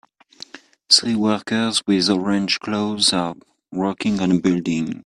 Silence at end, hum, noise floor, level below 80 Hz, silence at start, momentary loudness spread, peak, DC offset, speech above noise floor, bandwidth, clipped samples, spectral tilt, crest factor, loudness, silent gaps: 0.05 s; none; -44 dBFS; -58 dBFS; 0.55 s; 13 LU; 0 dBFS; under 0.1%; 24 dB; 12.5 kHz; under 0.1%; -4 dB/octave; 20 dB; -19 LUFS; none